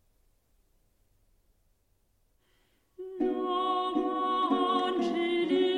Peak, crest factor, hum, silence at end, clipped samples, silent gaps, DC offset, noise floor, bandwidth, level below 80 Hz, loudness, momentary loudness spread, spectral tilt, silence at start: -16 dBFS; 16 dB; none; 0 s; under 0.1%; none; under 0.1%; -72 dBFS; 9.8 kHz; -68 dBFS; -29 LUFS; 6 LU; -5 dB/octave; 3 s